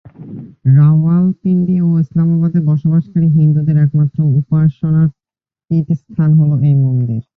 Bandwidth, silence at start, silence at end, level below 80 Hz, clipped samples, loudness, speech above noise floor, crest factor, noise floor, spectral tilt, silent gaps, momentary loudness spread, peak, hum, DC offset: 2 kHz; 0.2 s; 0.15 s; -48 dBFS; under 0.1%; -13 LUFS; over 79 dB; 10 dB; under -90 dBFS; -13 dB/octave; none; 7 LU; -2 dBFS; none; under 0.1%